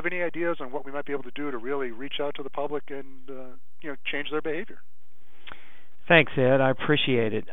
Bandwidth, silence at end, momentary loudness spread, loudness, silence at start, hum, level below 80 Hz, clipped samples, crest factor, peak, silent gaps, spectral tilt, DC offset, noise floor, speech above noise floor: over 20 kHz; 0 s; 23 LU; -26 LUFS; 0 s; none; -64 dBFS; under 0.1%; 26 dB; -2 dBFS; none; -8.5 dB/octave; 4%; -64 dBFS; 37 dB